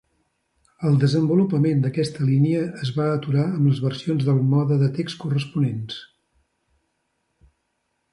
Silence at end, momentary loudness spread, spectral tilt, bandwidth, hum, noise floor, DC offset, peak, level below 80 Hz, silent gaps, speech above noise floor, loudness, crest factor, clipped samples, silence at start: 2.1 s; 7 LU; -8 dB/octave; 11 kHz; none; -73 dBFS; under 0.1%; -8 dBFS; -60 dBFS; none; 53 dB; -21 LUFS; 14 dB; under 0.1%; 0.8 s